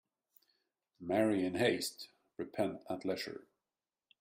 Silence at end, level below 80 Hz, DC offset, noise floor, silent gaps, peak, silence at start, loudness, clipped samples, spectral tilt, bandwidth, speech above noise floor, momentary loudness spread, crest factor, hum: 0.8 s; -76 dBFS; under 0.1%; under -90 dBFS; none; -18 dBFS; 1 s; -36 LUFS; under 0.1%; -4.5 dB/octave; 16 kHz; over 54 dB; 18 LU; 22 dB; none